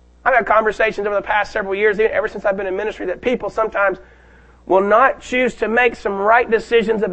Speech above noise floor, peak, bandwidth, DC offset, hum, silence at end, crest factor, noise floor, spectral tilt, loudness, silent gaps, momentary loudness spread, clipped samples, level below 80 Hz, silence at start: 30 dB; 0 dBFS; 8.6 kHz; under 0.1%; none; 0 s; 18 dB; -47 dBFS; -5 dB/octave; -17 LUFS; none; 7 LU; under 0.1%; -44 dBFS; 0.25 s